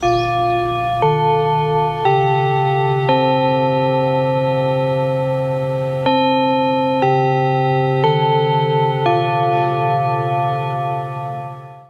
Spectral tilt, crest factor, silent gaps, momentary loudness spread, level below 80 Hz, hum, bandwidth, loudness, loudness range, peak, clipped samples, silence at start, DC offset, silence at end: -7.5 dB/octave; 12 dB; none; 5 LU; -48 dBFS; none; 7 kHz; -17 LUFS; 1 LU; -4 dBFS; under 0.1%; 0 s; under 0.1%; 0.05 s